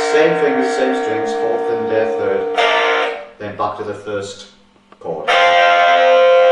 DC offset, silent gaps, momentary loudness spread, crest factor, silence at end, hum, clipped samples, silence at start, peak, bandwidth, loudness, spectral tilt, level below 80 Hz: under 0.1%; none; 16 LU; 14 dB; 0 s; none; under 0.1%; 0 s; 0 dBFS; 10.5 kHz; -15 LUFS; -3.5 dB/octave; -60 dBFS